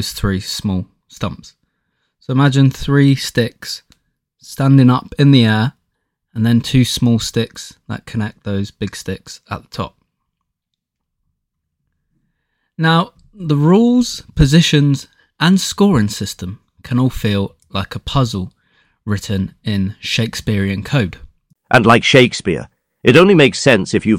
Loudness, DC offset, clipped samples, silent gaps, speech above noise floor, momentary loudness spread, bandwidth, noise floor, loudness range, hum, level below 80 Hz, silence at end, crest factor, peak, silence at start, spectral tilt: -15 LUFS; under 0.1%; 0.2%; none; 63 dB; 17 LU; 16 kHz; -77 dBFS; 12 LU; none; -38 dBFS; 0 s; 16 dB; 0 dBFS; 0 s; -5.5 dB/octave